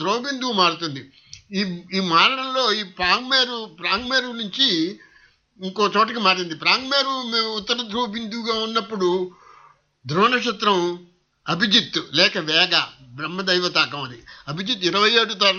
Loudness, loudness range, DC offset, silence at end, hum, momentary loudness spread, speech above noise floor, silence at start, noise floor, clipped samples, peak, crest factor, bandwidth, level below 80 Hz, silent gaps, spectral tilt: -20 LUFS; 3 LU; under 0.1%; 0 s; none; 13 LU; 34 dB; 0 s; -56 dBFS; under 0.1%; -2 dBFS; 20 dB; 7.2 kHz; -60 dBFS; none; -3.5 dB/octave